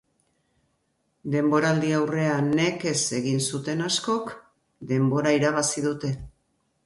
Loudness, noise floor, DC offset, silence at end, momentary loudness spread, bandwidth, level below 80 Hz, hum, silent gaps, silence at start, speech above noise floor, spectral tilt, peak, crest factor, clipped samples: -24 LUFS; -72 dBFS; under 0.1%; 0.55 s; 9 LU; 11.5 kHz; -58 dBFS; none; none; 1.25 s; 48 dB; -4.5 dB/octave; -8 dBFS; 18 dB; under 0.1%